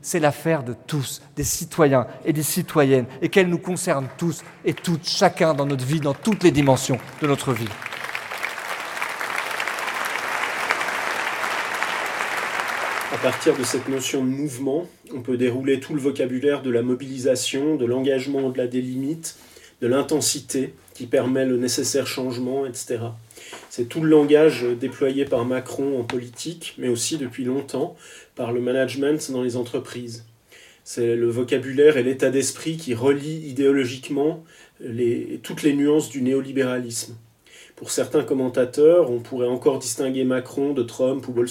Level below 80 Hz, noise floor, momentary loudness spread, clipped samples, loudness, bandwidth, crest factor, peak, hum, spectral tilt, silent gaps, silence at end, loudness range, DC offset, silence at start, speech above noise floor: -58 dBFS; -50 dBFS; 11 LU; under 0.1%; -22 LUFS; 17 kHz; 20 dB; -2 dBFS; none; -4.5 dB/octave; none; 0 s; 4 LU; under 0.1%; 0.05 s; 29 dB